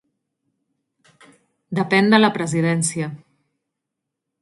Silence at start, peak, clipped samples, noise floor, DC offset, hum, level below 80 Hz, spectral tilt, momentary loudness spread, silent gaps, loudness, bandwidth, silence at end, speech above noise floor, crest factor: 1.7 s; 0 dBFS; under 0.1%; -82 dBFS; under 0.1%; none; -66 dBFS; -5 dB/octave; 14 LU; none; -19 LUFS; 11.5 kHz; 1.25 s; 64 dB; 22 dB